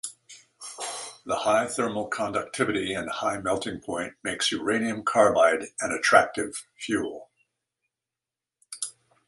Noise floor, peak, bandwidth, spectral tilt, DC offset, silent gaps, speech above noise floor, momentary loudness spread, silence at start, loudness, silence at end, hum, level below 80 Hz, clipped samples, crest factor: -89 dBFS; -4 dBFS; 11.5 kHz; -3 dB/octave; under 0.1%; none; 64 dB; 16 LU; 0.05 s; -26 LUFS; 0.35 s; none; -62 dBFS; under 0.1%; 24 dB